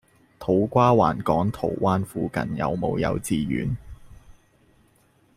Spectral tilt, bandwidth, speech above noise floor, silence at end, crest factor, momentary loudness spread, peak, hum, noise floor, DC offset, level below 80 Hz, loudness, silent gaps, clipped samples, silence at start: -7 dB/octave; 15.5 kHz; 38 dB; 1.05 s; 20 dB; 9 LU; -4 dBFS; none; -61 dBFS; under 0.1%; -48 dBFS; -24 LUFS; none; under 0.1%; 0.4 s